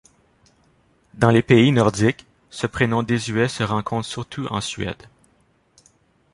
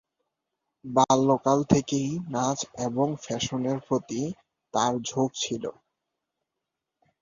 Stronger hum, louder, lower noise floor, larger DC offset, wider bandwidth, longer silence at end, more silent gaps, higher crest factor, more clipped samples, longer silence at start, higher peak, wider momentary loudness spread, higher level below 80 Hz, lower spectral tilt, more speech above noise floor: neither; first, -20 LUFS vs -26 LUFS; second, -61 dBFS vs -85 dBFS; neither; first, 11.5 kHz vs 7.6 kHz; about the same, 1.4 s vs 1.5 s; neither; about the same, 20 dB vs 24 dB; neither; first, 1.15 s vs 0.85 s; about the same, -2 dBFS vs -4 dBFS; first, 15 LU vs 10 LU; first, -48 dBFS vs -58 dBFS; about the same, -6 dB/octave vs -5 dB/octave; second, 42 dB vs 59 dB